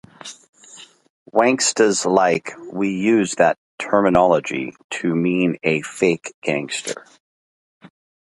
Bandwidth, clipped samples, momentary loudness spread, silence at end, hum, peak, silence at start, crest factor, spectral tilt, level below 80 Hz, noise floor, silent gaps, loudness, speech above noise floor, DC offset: 11.5 kHz; under 0.1%; 12 LU; 0.5 s; none; 0 dBFS; 0.25 s; 20 dB; -4 dB/octave; -56 dBFS; -45 dBFS; 0.49-0.53 s, 1.10-1.26 s, 3.57-3.78 s, 4.84-4.89 s, 6.34-6.42 s, 7.20-7.81 s; -19 LUFS; 26 dB; under 0.1%